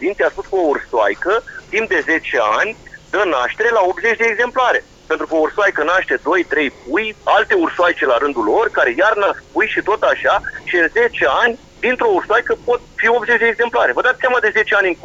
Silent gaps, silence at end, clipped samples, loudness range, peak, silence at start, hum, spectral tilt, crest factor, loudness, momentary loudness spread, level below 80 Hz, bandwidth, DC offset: none; 0.1 s; under 0.1%; 2 LU; -2 dBFS; 0 s; none; -3.5 dB/octave; 14 dB; -16 LUFS; 5 LU; -48 dBFS; 7.8 kHz; under 0.1%